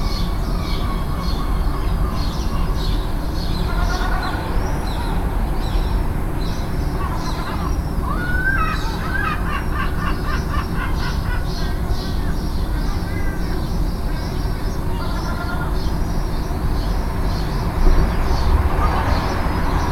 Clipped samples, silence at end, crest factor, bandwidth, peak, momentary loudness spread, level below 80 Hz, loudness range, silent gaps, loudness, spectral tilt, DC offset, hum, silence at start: under 0.1%; 0 s; 18 dB; 16 kHz; 0 dBFS; 5 LU; -20 dBFS; 3 LU; none; -23 LUFS; -6 dB/octave; under 0.1%; none; 0 s